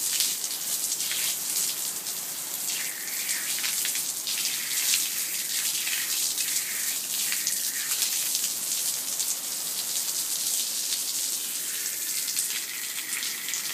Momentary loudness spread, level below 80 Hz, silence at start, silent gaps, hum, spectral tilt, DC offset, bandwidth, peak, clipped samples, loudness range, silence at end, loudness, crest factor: 4 LU; -86 dBFS; 0 s; none; none; 2.5 dB/octave; under 0.1%; 16 kHz; -2 dBFS; under 0.1%; 2 LU; 0 s; -26 LUFS; 28 dB